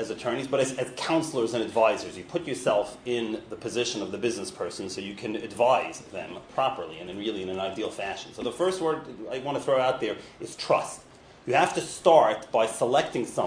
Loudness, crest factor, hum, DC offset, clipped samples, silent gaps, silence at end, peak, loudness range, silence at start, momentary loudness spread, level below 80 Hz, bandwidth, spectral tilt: -27 LUFS; 22 dB; none; under 0.1%; under 0.1%; none; 0 s; -6 dBFS; 5 LU; 0 s; 11 LU; -64 dBFS; 11 kHz; -4 dB/octave